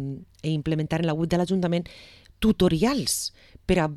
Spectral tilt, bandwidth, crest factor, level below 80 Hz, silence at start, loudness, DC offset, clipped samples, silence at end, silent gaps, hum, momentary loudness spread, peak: -5.5 dB/octave; 15 kHz; 16 dB; -44 dBFS; 0 s; -25 LUFS; under 0.1%; under 0.1%; 0 s; none; none; 12 LU; -8 dBFS